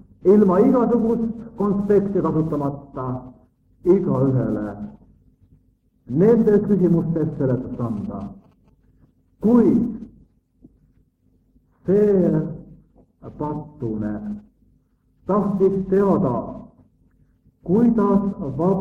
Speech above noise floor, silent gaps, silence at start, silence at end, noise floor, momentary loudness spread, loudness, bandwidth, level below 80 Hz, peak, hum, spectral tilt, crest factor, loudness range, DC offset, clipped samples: 43 dB; none; 0.25 s; 0 s; -61 dBFS; 16 LU; -20 LUFS; 3.5 kHz; -48 dBFS; -4 dBFS; none; -11.5 dB/octave; 18 dB; 4 LU; under 0.1%; under 0.1%